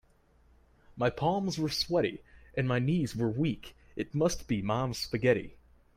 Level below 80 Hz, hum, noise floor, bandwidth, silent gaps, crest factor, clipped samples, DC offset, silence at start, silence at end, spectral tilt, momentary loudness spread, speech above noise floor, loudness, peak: -54 dBFS; none; -64 dBFS; 16 kHz; none; 18 dB; under 0.1%; under 0.1%; 0.9 s; 0.4 s; -5.5 dB/octave; 10 LU; 34 dB; -31 LUFS; -12 dBFS